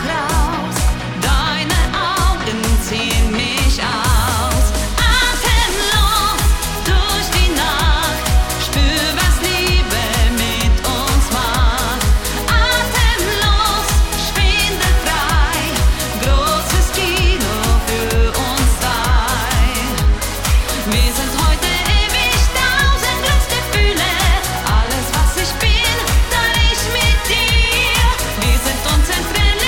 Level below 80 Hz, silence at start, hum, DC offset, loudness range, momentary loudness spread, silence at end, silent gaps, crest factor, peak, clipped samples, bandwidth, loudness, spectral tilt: -18 dBFS; 0 s; none; under 0.1%; 2 LU; 3 LU; 0 s; none; 12 dB; -2 dBFS; under 0.1%; 17.5 kHz; -15 LUFS; -3.5 dB/octave